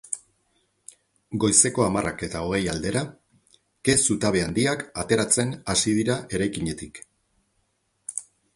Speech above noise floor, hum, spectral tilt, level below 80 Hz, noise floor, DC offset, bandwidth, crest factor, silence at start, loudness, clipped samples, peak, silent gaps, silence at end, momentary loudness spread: 48 dB; none; -3.5 dB/octave; -48 dBFS; -71 dBFS; under 0.1%; 11.5 kHz; 24 dB; 0.1 s; -23 LUFS; under 0.1%; -2 dBFS; none; 0.35 s; 15 LU